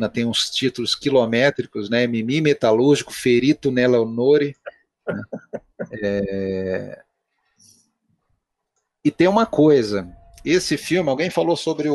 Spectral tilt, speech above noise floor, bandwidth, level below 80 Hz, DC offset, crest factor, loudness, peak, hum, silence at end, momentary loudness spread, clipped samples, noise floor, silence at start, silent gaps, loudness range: -5 dB/octave; 56 dB; 12 kHz; -54 dBFS; under 0.1%; 16 dB; -19 LUFS; -4 dBFS; none; 0 s; 15 LU; under 0.1%; -75 dBFS; 0 s; none; 10 LU